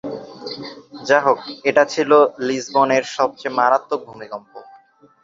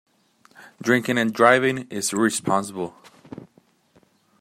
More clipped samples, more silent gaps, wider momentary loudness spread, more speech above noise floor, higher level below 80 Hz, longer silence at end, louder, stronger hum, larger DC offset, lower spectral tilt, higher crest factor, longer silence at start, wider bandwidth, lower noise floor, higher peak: neither; neither; second, 18 LU vs 26 LU; second, 33 dB vs 39 dB; about the same, -66 dBFS vs -66 dBFS; second, 0.6 s vs 0.95 s; first, -17 LUFS vs -21 LUFS; neither; neither; about the same, -4 dB/octave vs -4 dB/octave; about the same, 18 dB vs 22 dB; second, 0.05 s vs 0.6 s; second, 7.8 kHz vs 16 kHz; second, -50 dBFS vs -60 dBFS; about the same, -2 dBFS vs -2 dBFS